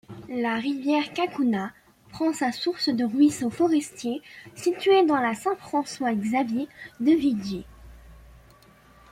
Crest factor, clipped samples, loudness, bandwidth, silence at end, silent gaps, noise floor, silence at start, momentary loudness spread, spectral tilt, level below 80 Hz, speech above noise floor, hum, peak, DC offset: 16 dB; under 0.1%; -25 LUFS; 15 kHz; 0.9 s; none; -54 dBFS; 0.1 s; 11 LU; -5 dB/octave; -58 dBFS; 30 dB; none; -10 dBFS; under 0.1%